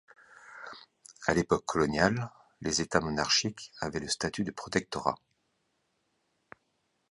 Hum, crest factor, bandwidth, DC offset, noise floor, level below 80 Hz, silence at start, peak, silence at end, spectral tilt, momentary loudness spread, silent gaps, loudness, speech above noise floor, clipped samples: none; 24 dB; 11.5 kHz; under 0.1%; -77 dBFS; -56 dBFS; 0.45 s; -8 dBFS; 1.95 s; -3.5 dB/octave; 19 LU; none; -30 LUFS; 47 dB; under 0.1%